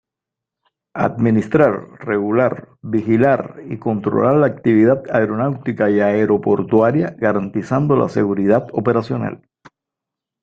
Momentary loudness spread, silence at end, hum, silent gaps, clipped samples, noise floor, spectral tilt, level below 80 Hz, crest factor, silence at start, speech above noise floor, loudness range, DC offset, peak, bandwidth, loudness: 9 LU; 1.05 s; none; none; under 0.1%; -85 dBFS; -9.5 dB/octave; -54 dBFS; 16 dB; 0.95 s; 68 dB; 3 LU; under 0.1%; -2 dBFS; 7.6 kHz; -17 LUFS